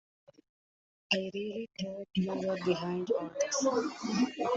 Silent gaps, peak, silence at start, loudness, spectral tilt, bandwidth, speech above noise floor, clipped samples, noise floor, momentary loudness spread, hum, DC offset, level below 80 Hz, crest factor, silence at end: none; -14 dBFS; 1.1 s; -33 LUFS; -4.5 dB/octave; 8 kHz; over 57 dB; under 0.1%; under -90 dBFS; 8 LU; none; under 0.1%; -72 dBFS; 20 dB; 0 s